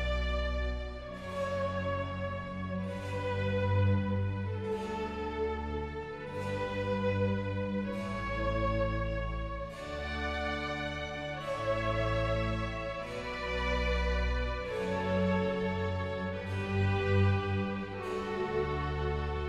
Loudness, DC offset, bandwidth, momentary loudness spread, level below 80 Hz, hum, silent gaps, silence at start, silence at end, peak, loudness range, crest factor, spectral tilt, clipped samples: -34 LUFS; under 0.1%; 9.8 kHz; 8 LU; -42 dBFS; none; none; 0 s; 0 s; -18 dBFS; 3 LU; 16 dB; -7 dB/octave; under 0.1%